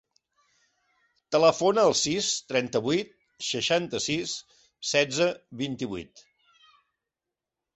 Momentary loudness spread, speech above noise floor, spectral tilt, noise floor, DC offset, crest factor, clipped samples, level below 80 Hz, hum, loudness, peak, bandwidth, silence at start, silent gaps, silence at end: 13 LU; 62 dB; -3 dB/octave; -88 dBFS; under 0.1%; 22 dB; under 0.1%; -64 dBFS; none; -26 LUFS; -6 dBFS; 8.4 kHz; 1.3 s; none; 1.7 s